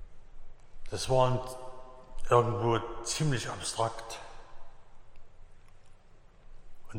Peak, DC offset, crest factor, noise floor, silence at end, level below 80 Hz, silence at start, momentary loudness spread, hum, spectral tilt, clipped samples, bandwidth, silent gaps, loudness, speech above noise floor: -10 dBFS; under 0.1%; 22 dB; -54 dBFS; 0 s; -46 dBFS; 0 s; 22 LU; none; -5 dB/octave; under 0.1%; 16 kHz; none; -31 LUFS; 25 dB